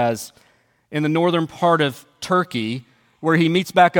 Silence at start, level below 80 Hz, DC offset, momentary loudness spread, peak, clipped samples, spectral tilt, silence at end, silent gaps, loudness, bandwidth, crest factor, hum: 0 s; -64 dBFS; under 0.1%; 12 LU; 0 dBFS; under 0.1%; -5.5 dB/octave; 0 s; none; -20 LUFS; 17.5 kHz; 20 dB; none